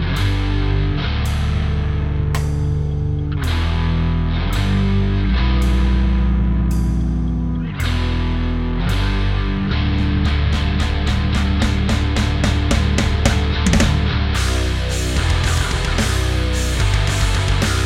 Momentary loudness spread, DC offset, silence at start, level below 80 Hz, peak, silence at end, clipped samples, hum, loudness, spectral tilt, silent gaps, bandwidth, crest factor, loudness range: 3 LU; under 0.1%; 0 s; -20 dBFS; 0 dBFS; 0 s; under 0.1%; none; -19 LUFS; -5.5 dB/octave; none; 14.5 kHz; 16 dB; 3 LU